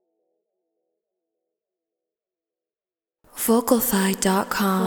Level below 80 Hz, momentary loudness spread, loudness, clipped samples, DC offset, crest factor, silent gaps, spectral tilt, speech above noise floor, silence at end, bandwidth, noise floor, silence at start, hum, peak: -58 dBFS; 6 LU; -21 LUFS; under 0.1%; under 0.1%; 20 dB; none; -4.5 dB/octave; over 70 dB; 0 s; over 20 kHz; under -90 dBFS; 3.35 s; none; -4 dBFS